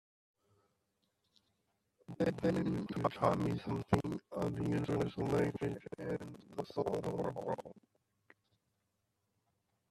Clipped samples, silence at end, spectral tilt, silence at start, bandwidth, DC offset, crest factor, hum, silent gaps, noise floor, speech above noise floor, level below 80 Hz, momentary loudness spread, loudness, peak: under 0.1%; 2.1 s; -7.5 dB/octave; 2.1 s; 13.5 kHz; under 0.1%; 26 dB; none; none; -83 dBFS; 47 dB; -64 dBFS; 10 LU; -37 LUFS; -12 dBFS